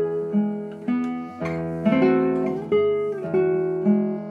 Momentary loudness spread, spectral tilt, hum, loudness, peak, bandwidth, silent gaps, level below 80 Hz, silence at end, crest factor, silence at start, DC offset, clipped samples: 9 LU; -9 dB/octave; none; -23 LUFS; -8 dBFS; 6.6 kHz; none; -58 dBFS; 0 s; 16 dB; 0 s; under 0.1%; under 0.1%